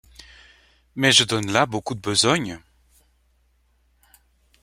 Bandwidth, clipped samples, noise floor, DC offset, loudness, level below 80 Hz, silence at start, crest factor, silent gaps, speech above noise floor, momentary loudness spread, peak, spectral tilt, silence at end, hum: 16.5 kHz; under 0.1%; -63 dBFS; under 0.1%; -19 LUFS; -56 dBFS; 0.95 s; 22 dB; none; 43 dB; 18 LU; -2 dBFS; -2.5 dB/octave; 2.05 s; none